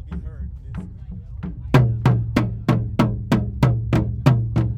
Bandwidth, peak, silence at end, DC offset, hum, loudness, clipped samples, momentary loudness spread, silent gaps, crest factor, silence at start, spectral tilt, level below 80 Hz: 8.4 kHz; 0 dBFS; 0 s; under 0.1%; none; -20 LUFS; under 0.1%; 16 LU; none; 20 dB; 0 s; -8 dB/octave; -32 dBFS